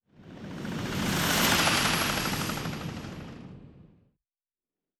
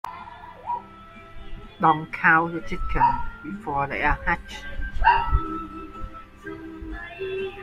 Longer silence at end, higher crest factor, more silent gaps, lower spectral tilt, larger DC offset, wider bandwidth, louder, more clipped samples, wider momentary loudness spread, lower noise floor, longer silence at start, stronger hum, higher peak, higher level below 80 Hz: first, 1.15 s vs 0 s; about the same, 20 dB vs 20 dB; neither; second, -3 dB/octave vs -6.5 dB/octave; neither; first, 19 kHz vs 9.8 kHz; second, -27 LUFS vs -24 LUFS; neither; about the same, 21 LU vs 21 LU; first, under -90 dBFS vs -44 dBFS; first, 0.2 s vs 0.05 s; neither; second, -10 dBFS vs -6 dBFS; second, -50 dBFS vs -34 dBFS